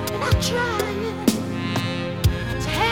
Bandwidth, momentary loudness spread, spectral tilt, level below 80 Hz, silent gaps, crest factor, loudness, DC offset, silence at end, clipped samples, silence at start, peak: 20 kHz; 5 LU; -5 dB/octave; -34 dBFS; none; 18 dB; -23 LUFS; 0.3%; 0 s; under 0.1%; 0 s; -4 dBFS